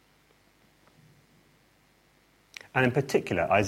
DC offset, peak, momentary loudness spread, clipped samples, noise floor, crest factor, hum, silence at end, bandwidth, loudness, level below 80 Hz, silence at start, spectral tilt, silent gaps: under 0.1%; -8 dBFS; 22 LU; under 0.1%; -64 dBFS; 22 dB; 50 Hz at -70 dBFS; 0 s; 16.5 kHz; -27 LUFS; -62 dBFS; 2.75 s; -6 dB/octave; none